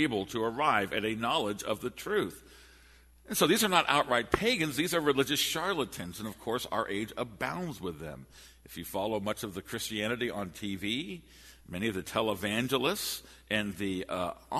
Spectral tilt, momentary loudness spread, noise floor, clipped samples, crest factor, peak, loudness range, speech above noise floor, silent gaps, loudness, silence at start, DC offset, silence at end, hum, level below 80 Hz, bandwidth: -3.5 dB/octave; 12 LU; -58 dBFS; under 0.1%; 24 dB; -8 dBFS; 8 LU; 26 dB; none; -31 LUFS; 0 s; under 0.1%; 0 s; none; -58 dBFS; 13.5 kHz